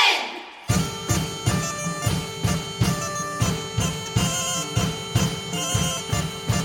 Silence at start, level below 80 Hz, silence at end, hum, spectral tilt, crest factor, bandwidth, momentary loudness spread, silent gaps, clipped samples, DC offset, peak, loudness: 0 s; -40 dBFS; 0 s; none; -3.5 dB/octave; 20 dB; 17 kHz; 3 LU; none; under 0.1%; under 0.1%; -6 dBFS; -24 LUFS